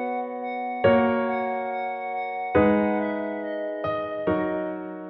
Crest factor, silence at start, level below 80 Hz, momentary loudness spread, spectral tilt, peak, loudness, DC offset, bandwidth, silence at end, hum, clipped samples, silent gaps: 18 dB; 0 s; -54 dBFS; 10 LU; -10 dB/octave; -8 dBFS; -25 LUFS; under 0.1%; 5.4 kHz; 0 s; none; under 0.1%; none